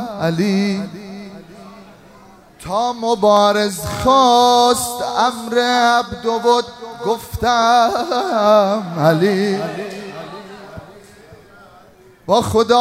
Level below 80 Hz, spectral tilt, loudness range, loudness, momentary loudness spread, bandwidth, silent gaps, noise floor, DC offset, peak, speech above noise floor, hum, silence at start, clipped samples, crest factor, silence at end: -46 dBFS; -4.5 dB/octave; 7 LU; -16 LUFS; 21 LU; 16 kHz; none; -46 dBFS; under 0.1%; 0 dBFS; 31 dB; none; 0 s; under 0.1%; 16 dB; 0 s